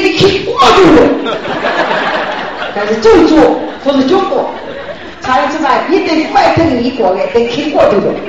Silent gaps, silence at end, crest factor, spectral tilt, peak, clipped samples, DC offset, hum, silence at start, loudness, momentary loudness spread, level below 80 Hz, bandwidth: none; 0 s; 10 dB; -5 dB/octave; 0 dBFS; 0.8%; 1%; none; 0 s; -10 LUFS; 12 LU; -36 dBFS; 8.8 kHz